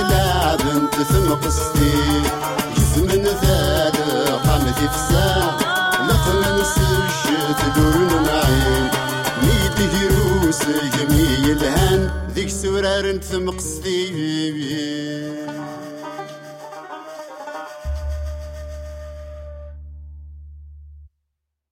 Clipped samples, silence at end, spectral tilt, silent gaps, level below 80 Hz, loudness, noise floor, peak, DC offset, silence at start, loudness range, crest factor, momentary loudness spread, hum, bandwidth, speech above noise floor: under 0.1%; 0.65 s; -4.5 dB/octave; none; -28 dBFS; -18 LUFS; -77 dBFS; -4 dBFS; under 0.1%; 0 s; 15 LU; 16 dB; 18 LU; none; 17 kHz; 59 dB